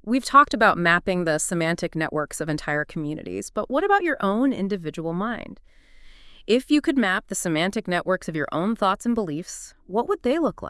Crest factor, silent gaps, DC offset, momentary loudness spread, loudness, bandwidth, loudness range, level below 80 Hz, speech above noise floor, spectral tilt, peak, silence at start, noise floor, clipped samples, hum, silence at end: 22 dB; none; under 0.1%; 12 LU; -23 LUFS; 12 kHz; 3 LU; -50 dBFS; 23 dB; -4.5 dB/octave; -2 dBFS; 0.05 s; -46 dBFS; under 0.1%; none; 0 s